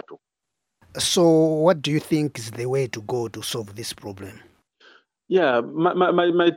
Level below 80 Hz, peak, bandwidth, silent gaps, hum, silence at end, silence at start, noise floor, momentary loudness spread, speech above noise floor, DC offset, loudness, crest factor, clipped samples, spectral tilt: -62 dBFS; -4 dBFS; 17 kHz; none; none; 0 s; 0.1 s; -83 dBFS; 16 LU; 62 dB; under 0.1%; -22 LUFS; 18 dB; under 0.1%; -5 dB/octave